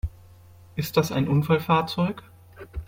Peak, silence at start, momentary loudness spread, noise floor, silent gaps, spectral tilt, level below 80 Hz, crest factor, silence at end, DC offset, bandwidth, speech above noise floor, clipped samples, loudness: -6 dBFS; 0.05 s; 16 LU; -49 dBFS; none; -6.5 dB/octave; -42 dBFS; 18 dB; 0.05 s; under 0.1%; 17 kHz; 26 dB; under 0.1%; -24 LUFS